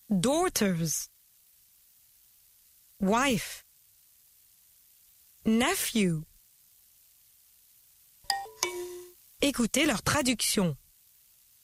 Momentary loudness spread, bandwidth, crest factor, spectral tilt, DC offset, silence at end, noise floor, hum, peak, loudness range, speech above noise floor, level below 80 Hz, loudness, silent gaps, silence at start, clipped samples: 14 LU; 16 kHz; 24 dB; -3.5 dB/octave; under 0.1%; 0.85 s; -62 dBFS; none; -8 dBFS; 5 LU; 35 dB; -56 dBFS; -28 LUFS; none; 0.1 s; under 0.1%